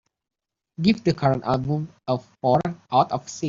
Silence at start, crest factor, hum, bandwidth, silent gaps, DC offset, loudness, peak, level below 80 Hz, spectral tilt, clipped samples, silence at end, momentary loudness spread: 0.8 s; 18 dB; none; 7.6 kHz; none; under 0.1%; -23 LUFS; -6 dBFS; -54 dBFS; -6 dB/octave; under 0.1%; 0 s; 7 LU